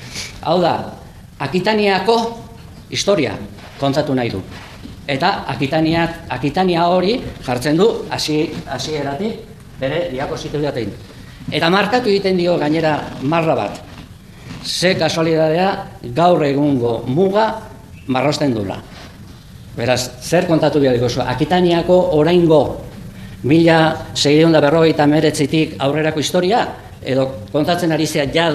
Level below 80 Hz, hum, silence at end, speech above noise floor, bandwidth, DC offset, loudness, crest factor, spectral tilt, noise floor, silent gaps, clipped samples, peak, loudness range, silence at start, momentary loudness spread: -42 dBFS; none; 0 s; 21 dB; 14.5 kHz; 0.1%; -16 LUFS; 16 dB; -5.5 dB/octave; -37 dBFS; none; under 0.1%; 0 dBFS; 6 LU; 0 s; 17 LU